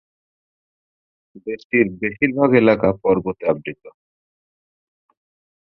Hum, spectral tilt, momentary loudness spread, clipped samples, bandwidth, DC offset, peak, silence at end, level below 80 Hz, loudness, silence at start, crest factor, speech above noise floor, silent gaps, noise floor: none; -9.5 dB/octave; 17 LU; under 0.1%; 5.8 kHz; under 0.1%; -2 dBFS; 1.7 s; -54 dBFS; -18 LUFS; 1.35 s; 20 dB; over 72 dB; 1.64-1.70 s; under -90 dBFS